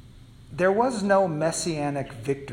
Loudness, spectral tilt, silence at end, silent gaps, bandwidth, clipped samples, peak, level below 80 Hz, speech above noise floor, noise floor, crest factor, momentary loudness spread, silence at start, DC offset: -25 LUFS; -5 dB/octave; 0 s; none; 14.5 kHz; under 0.1%; -8 dBFS; -54 dBFS; 23 dB; -48 dBFS; 18 dB; 9 LU; 0.05 s; under 0.1%